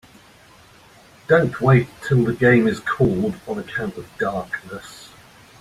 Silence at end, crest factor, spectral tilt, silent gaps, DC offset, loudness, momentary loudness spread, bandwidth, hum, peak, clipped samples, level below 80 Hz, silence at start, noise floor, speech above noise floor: 0.55 s; 18 dB; -7.5 dB/octave; none; under 0.1%; -20 LUFS; 20 LU; 13 kHz; none; -2 dBFS; under 0.1%; -50 dBFS; 1.3 s; -49 dBFS; 30 dB